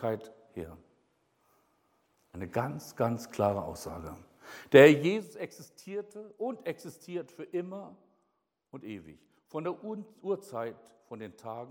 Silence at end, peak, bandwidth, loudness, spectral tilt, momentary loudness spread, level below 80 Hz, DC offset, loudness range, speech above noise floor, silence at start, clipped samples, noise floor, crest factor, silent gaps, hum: 0 s; -6 dBFS; 17.5 kHz; -29 LUFS; -6 dB/octave; 21 LU; -66 dBFS; under 0.1%; 15 LU; 49 dB; 0 s; under 0.1%; -79 dBFS; 26 dB; none; none